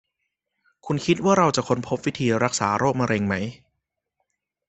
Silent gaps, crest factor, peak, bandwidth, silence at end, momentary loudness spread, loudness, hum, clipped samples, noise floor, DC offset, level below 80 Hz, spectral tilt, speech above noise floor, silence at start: none; 22 dB; -2 dBFS; 8.4 kHz; 1.15 s; 8 LU; -22 LUFS; none; under 0.1%; -80 dBFS; under 0.1%; -58 dBFS; -5 dB/octave; 58 dB; 0.85 s